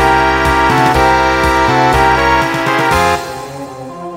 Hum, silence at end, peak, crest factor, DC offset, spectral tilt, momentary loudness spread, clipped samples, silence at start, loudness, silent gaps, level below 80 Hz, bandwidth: none; 0 s; 0 dBFS; 12 dB; under 0.1%; -4.5 dB/octave; 15 LU; under 0.1%; 0 s; -11 LUFS; none; -26 dBFS; 16.5 kHz